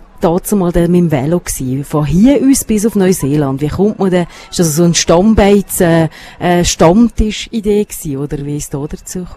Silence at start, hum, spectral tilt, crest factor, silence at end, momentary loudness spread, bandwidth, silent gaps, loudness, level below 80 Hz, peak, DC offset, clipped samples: 0.2 s; none; -5.5 dB/octave; 12 dB; 0 s; 11 LU; 15 kHz; none; -12 LUFS; -28 dBFS; 0 dBFS; under 0.1%; 0.2%